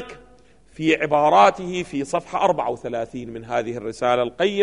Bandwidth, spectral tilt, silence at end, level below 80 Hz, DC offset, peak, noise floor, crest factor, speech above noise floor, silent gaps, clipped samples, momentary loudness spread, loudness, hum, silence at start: 10.5 kHz; -5 dB/octave; 0 s; -56 dBFS; 0.2%; -4 dBFS; -53 dBFS; 18 dB; 32 dB; none; under 0.1%; 13 LU; -21 LUFS; none; 0 s